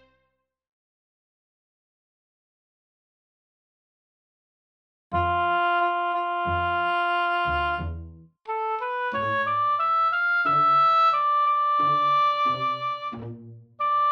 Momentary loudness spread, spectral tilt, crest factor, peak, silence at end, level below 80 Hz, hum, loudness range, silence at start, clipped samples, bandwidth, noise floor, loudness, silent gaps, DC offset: 12 LU; -6 dB/octave; 12 dB; -12 dBFS; 0 s; -50 dBFS; none; 7 LU; 5.1 s; under 0.1%; over 20 kHz; -75 dBFS; -23 LUFS; none; under 0.1%